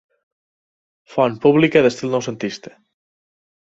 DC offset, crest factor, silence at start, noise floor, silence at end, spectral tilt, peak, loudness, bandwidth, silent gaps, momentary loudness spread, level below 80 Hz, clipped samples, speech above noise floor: under 0.1%; 20 dB; 1.1 s; under -90 dBFS; 1.05 s; -6 dB/octave; -2 dBFS; -17 LUFS; 8 kHz; none; 14 LU; -60 dBFS; under 0.1%; over 73 dB